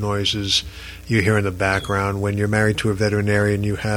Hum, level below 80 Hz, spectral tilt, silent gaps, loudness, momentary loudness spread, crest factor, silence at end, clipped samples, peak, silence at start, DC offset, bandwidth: none; -40 dBFS; -5 dB/octave; none; -20 LUFS; 4 LU; 16 dB; 0 s; under 0.1%; -4 dBFS; 0 s; under 0.1%; 16 kHz